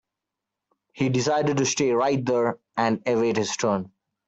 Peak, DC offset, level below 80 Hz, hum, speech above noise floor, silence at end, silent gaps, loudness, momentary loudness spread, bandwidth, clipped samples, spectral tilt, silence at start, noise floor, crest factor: -8 dBFS; under 0.1%; -64 dBFS; none; 63 dB; 0.4 s; none; -24 LUFS; 5 LU; 8.2 kHz; under 0.1%; -4.5 dB/octave; 0.95 s; -85 dBFS; 16 dB